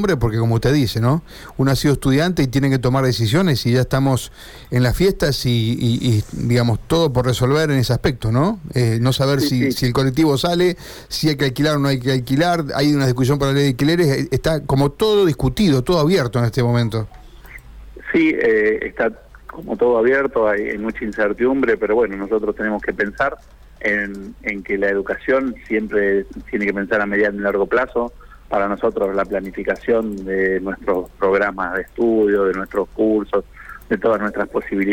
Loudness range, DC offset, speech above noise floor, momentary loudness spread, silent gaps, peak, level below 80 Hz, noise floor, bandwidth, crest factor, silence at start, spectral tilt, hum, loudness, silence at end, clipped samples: 3 LU; under 0.1%; 21 dB; 7 LU; none; -6 dBFS; -38 dBFS; -39 dBFS; 18 kHz; 12 dB; 0 s; -6.5 dB/octave; none; -18 LUFS; 0 s; under 0.1%